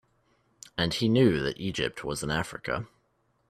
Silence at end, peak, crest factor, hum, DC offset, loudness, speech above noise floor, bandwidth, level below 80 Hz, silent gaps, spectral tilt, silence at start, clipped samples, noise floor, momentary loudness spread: 0.65 s; -10 dBFS; 20 dB; none; under 0.1%; -28 LUFS; 44 dB; 14.5 kHz; -52 dBFS; none; -5.5 dB/octave; 0.75 s; under 0.1%; -71 dBFS; 11 LU